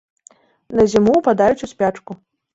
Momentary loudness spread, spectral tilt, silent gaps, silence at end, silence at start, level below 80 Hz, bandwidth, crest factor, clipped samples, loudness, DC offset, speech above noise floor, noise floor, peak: 22 LU; -6.5 dB/octave; none; 0.4 s; 0.7 s; -48 dBFS; 8 kHz; 16 dB; under 0.1%; -16 LUFS; under 0.1%; 35 dB; -51 dBFS; -2 dBFS